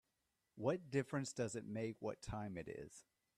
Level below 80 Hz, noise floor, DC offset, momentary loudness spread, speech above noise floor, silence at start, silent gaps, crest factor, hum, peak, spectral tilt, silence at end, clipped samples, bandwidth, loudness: -68 dBFS; -87 dBFS; under 0.1%; 11 LU; 43 dB; 0.55 s; none; 20 dB; none; -24 dBFS; -6 dB/octave; 0.35 s; under 0.1%; 13.5 kHz; -45 LUFS